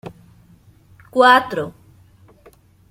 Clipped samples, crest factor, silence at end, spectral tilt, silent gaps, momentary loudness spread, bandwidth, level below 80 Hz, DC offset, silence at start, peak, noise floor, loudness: under 0.1%; 20 dB; 1.2 s; -4.5 dB/octave; none; 20 LU; 15.5 kHz; -58 dBFS; under 0.1%; 0.05 s; -2 dBFS; -50 dBFS; -15 LUFS